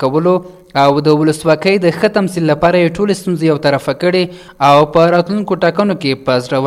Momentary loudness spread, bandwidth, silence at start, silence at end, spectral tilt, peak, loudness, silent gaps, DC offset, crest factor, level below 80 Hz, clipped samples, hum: 6 LU; 15 kHz; 0 s; 0 s; -6.5 dB/octave; 0 dBFS; -13 LUFS; none; under 0.1%; 12 dB; -46 dBFS; under 0.1%; none